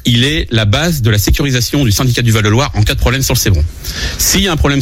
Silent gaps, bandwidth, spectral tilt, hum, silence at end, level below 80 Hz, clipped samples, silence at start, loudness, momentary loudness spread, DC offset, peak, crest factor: none; 16.5 kHz; -4 dB/octave; none; 0 s; -20 dBFS; under 0.1%; 0.05 s; -12 LUFS; 3 LU; under 0.1%; 0 dBFS; 12 dB